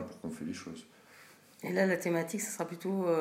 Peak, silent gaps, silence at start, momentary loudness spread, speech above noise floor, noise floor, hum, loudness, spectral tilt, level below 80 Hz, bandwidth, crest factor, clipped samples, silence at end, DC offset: -16 dBFS; none; 0 s; 14 LU; 25 dB; -58 dBFS; none; -34 LUFS; -5 dB/octave; -78 dBFS; 16 kHz; 18 dB; under 0.1%; 0 s; under 0.1%